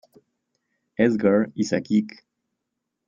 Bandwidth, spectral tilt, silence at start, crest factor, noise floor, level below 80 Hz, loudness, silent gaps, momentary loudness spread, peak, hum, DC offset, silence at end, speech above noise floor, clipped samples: 7.6 kHz; -6.5 dB/octave; 1 s; 20 dB; -81 dBFS; -64 dBFS; -22 LUFS; none; 13 LU; -6 dBFS; none; under 0.1%; 0.95 s; 60 dB; under 0.1%